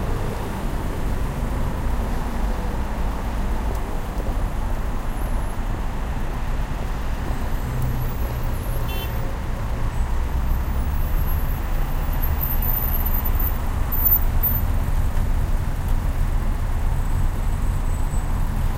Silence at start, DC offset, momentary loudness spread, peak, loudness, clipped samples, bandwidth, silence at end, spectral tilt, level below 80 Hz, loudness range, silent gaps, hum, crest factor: 0 s; under 0.1%; 7 LU; -6 dBFS; -25 LUFS; under 0.1%; 16 kHz; 0 s; -6.5 dB/octave; -22 dBFS; 6 LU; none; none; 14 dB